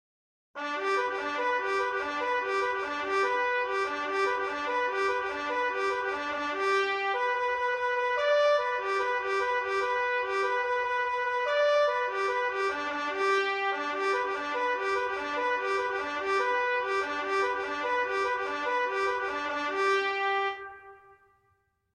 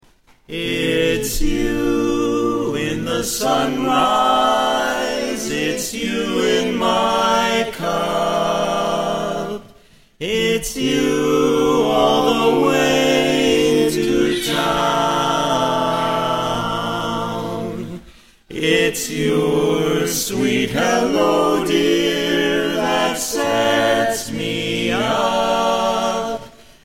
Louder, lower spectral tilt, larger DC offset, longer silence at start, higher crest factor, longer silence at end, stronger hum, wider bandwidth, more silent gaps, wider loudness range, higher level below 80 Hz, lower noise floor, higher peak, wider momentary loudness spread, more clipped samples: second, -28 LUFS vs -18 LUFS; second, -2 dB/octave vs -4 dB/octave; second, under 0.1% vs 0.5%; about the same, 0.55 s vs 0.5 s; about the same, 14 dB vs 16 dB; first, 0.95 s vs 0.35 s; neither; second, 11 kHz vs 16.5 kHz; neither; about the same, 2 LU vs 4 LU; second, -68 dBFS vs -38 dBFS; first, -72 dBFS vs -49 dBFS; second, -14 dBFS vs -2 dBFS; about the same, 5 LU vs 7 LU; neither